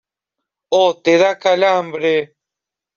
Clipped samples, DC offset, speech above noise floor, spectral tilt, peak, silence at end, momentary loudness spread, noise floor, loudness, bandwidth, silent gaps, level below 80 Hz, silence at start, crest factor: under 0.1%; under 0.1%; 71 dB; -4 dB/octave; -2 dBFS; 0.7 s; 6 LU; -85 dBFS; -15 LUFS; 7.2 kHz; none; -64 dBFS; 0.7 s; 16 dB